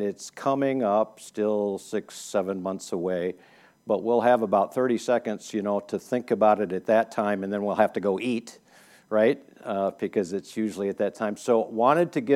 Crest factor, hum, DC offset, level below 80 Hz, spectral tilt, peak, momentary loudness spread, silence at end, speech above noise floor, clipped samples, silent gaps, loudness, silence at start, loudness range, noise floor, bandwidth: 20 dB; none; under 0.1%; -76 dBFS; -6 dB/octave; -6 dBFS; 10 LU; 0 s; 30 dB; under 0.1%; none; -26 LUFS; 0 s; 4 LU; -55 dBFS; 15 kHz